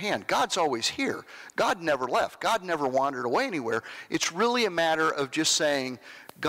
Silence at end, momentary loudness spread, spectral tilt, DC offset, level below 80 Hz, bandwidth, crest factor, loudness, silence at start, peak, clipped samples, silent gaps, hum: 0 s; 8 LU; -2.5 dB/octave; under 0.1%; -66 dBFS; 16 kHz; 12 dB; -27 LUFS; 0 s; -16 dBFS; under 0.1%; none; none